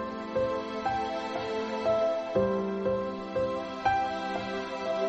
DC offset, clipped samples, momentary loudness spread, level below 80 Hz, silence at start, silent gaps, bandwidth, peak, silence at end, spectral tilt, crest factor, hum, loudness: under 0.1%; under 0.1%; 5 LU; -56 dBFS; 0 s; none; 8.4 kHz; -14 dBFS; 0 s; -6 dB/octave; 16 dB; none; -31 LUFS